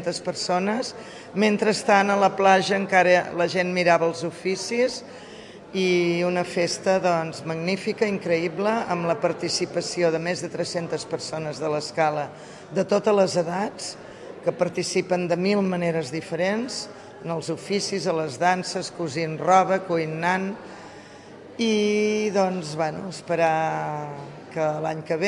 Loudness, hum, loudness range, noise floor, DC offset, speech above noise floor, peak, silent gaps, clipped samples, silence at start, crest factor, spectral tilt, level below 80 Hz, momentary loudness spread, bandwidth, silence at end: -24 LUFS; none; 5 LU; -44 dBFS; under 0.1%; 20 dB; -4 dBFS; none; under 0.1%; 0 s; 20 dB; -4.5 dB/octave; -66 dBFS; 15 LU; 11.5 kHz; 0 s